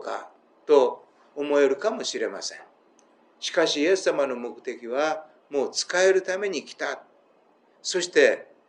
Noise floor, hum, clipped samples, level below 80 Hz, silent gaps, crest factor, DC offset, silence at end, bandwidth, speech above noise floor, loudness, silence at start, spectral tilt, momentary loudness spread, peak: -61 dBFS; none; under 0.1%; under -90 dBFS; none; 20 dB; under 0.1%; 0.25 s; 10 kHz; 37 dB; -25 LUFS; 0 s; -2 dB/octave; 14 LU; -6 dBFS